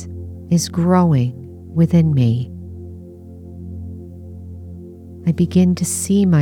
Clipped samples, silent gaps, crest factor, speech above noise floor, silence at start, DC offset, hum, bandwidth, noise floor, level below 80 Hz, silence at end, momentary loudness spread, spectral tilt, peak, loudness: under 0.1%; none; 14 dB; 22 dB; 0 s; under 0.1%; none; 15.5 kHz; -36 dBFS; -44 dBFS; 0 s; 22 LU; -6.5 dB/octave; -4 dBFS; -17 LUFS